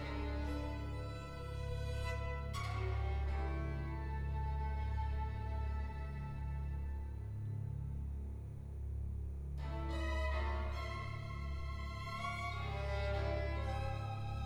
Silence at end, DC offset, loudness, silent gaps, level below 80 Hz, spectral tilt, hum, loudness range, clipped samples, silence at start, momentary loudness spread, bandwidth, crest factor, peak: 0 s; under 0.1%; -42 LUFS; none; -42 dBFS; -7 dB/octave; none; 4 LU; under 0.1%; 0 s; 6 LU; 10.5 kHz; 14 dB; -26 dBFS